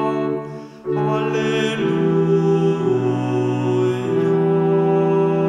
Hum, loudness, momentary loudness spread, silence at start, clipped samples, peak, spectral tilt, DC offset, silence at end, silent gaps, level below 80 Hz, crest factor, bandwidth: none; -19 LUFS; 6 LU; 0 s; under 0.1%; -6 dBFS; -7.5 dB/octave; under 0.1%; 0 s; none; -62 dBFS; 12 dB; 9.4 kHz